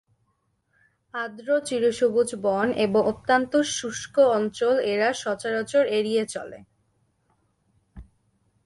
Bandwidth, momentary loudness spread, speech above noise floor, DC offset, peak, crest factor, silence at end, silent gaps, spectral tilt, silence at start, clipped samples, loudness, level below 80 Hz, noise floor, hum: 11.5 kHz; 11 LU; 48 dB; under 0.1%; -8 dBFS; 18 dB; 0.6 s; none; -4 dB/octave; 1.15 s; under 0.1%; -24 LUFS; -60 dBFS; -72 dBFS; none